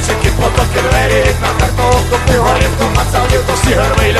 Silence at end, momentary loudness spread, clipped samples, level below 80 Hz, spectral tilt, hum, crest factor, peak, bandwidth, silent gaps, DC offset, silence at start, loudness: 0 s; 2 LU; under 0.1%; -18 dBFS; -4.5 dB/octave; none; 10 dB; 0 dBFS; 13.5 kHz; none; under 0.1%; 0 s; -12 LUFS